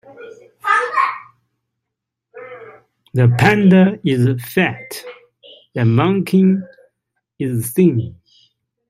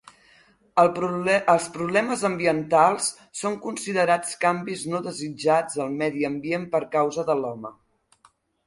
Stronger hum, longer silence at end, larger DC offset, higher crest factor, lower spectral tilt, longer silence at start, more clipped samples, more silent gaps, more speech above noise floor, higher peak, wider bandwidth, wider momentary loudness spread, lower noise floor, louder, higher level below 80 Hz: neither; second, 0.8 s vs 0.95 s; neither; about the same, 16 dB vs 20 dB; first, -7 dB/octave vs -4.5 dB/octave; second, 0.2 s vs 0.75 s; neither; neither; first, 66 dB vs 38 dB; first, 0 dBFS vs -4 dBFS; first, 16 kHz vs 11.5 kHz; first, 19 LU vs 9 LU; first, -80 dBFS vs -61 dBFS; first, -16 LUFS vs -24 LUFS; first, -54 dBFS vs -66 dBFS